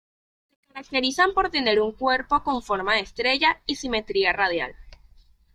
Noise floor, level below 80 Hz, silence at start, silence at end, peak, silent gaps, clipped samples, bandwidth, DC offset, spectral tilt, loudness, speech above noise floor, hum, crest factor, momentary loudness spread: -54 dBFS; -50 dBFS; 0.75 s; 0.65 s; -6 dBFS; none; under 0.1%; 13 kHz; under 0.1%; -3 dB/octave; -23 LUFS; 31 dB; none; 20 dB; 8 LU